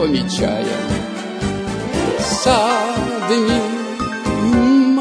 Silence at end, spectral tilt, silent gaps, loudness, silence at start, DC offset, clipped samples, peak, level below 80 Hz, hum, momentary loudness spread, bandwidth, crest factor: 0 s; -5 dB/octave; none; -18 LUFS; 0 s; under 0.1%; under 0.1%; -2 dBFS; -38 dBFS; none; 9 LU; 11 kHz; 16 dB